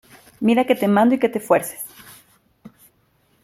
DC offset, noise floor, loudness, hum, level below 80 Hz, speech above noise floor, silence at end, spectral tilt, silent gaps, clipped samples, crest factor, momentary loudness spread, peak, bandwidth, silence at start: under 0.1%; -62 dBFS; -18 LUFS; none; -64 dBFS; 44 dB; 0.75 s; -5.5 dB/octave; none; under 0.1%; 18 dB; 15 LU; -2 dBFS; 16 kHz; 0.4 s